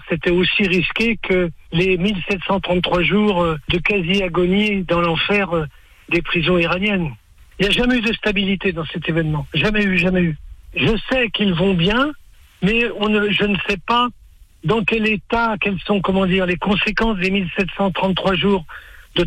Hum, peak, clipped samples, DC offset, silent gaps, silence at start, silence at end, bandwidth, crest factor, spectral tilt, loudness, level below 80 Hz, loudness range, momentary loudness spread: none; -6 dBFS; under 0.1%; under 0.1%; none; 0 s; 0 s; 10.5 kHz; 12 dB; -6.5 dB/octave; -18 LUFS; -36 dBFS; 1 LU; 6 LU